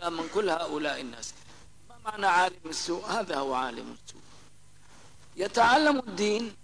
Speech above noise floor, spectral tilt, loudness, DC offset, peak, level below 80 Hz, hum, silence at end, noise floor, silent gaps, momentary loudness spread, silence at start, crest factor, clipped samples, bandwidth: 30 dB; -3 dB/octave; -28 LUFS; 0.3%; -12 dBFS; -62 dBFS; 50 Hz at -60 dBFS; 0.1 s; -58 dBFS; none; 19 LU; 0 s; 18 dB; under 0.1%; 11 kHz